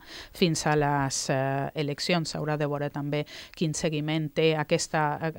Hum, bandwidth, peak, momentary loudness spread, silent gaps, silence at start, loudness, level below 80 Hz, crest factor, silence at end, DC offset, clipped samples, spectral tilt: none; 16.5 kHz; -10 dBFS; 7 LU; none; 0.05 s; -27 LUFS; -56 dBFS; 18 dB; 0 s; under 0.1%; under 0.1%; -4.5 dB/octave